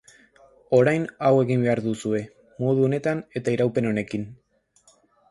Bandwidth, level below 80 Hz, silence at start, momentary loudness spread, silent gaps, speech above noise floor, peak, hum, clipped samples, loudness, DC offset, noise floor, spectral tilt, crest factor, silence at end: 11.5 kHz; -62 dBFS; 0.7 s; 10 LU; none; 39 dB; -6 dBFS; none; under 0.1%; -23 LUFS; under 0.1%; -61 dBFS; -7.5 dB/octave; 18 dB; 0.95 s